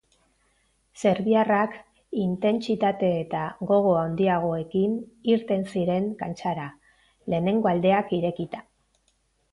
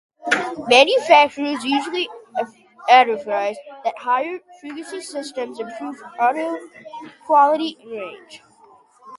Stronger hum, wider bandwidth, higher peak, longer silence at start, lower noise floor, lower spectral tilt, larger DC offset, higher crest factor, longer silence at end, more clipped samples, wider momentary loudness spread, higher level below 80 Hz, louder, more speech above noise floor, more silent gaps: neither; about the same, 11 kHz vs 11.5 kHz; second, -8 dBFS vs 0 dBFS; first, 0.95 s vs 0.25 s; first, -69 dBFS vs -51 dBFS; first, -7.5 dB/octave vs -2.5 dB/octave; neither; about the same, 16 dB vs 20 dB; first, 0.9 s vs 0 s; neither; second, 11 LU vs 19 LU; first, -60 dBFS vs -70 dBFS; second, -25 LUFS vs -19 LUFS; first, 45 dB vs 32 dB; neither